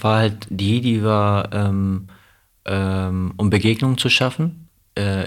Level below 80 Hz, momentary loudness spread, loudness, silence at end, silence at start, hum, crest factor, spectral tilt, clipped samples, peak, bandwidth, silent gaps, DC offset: -50 dBFS; 9 LU; -19 LUFS; 0 s; 0 s; none; 18 dB; -6 dB/octave; under 0.1%; -2 dBFS; 14 kHz; none; under 0.1%